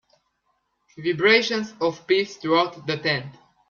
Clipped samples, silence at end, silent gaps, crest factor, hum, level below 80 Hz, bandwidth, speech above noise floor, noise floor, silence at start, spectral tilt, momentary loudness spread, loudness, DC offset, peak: under 0.1%; 0.4 s; none; 20 dB; none; -66 dBFS; 7.4 kHz; 49 dB; -72 dBFS; 1 s; -4.5 dB/octave; 10 LU; -22 LUFS; under 0.1%; -4 dBFS